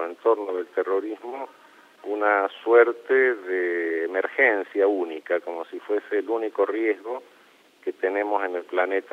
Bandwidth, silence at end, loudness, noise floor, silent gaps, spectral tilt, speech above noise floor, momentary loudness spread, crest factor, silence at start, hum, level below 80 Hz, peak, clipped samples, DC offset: 5.8 kHz; 0.1 s; -24 LUFS; -56 dBFS; none; -4 dB/octave; 32 dB; 14 LU; 18 dB; 0 s; none; under -90 dBFS; -6 dBFS; under 0.1%; under 0.1%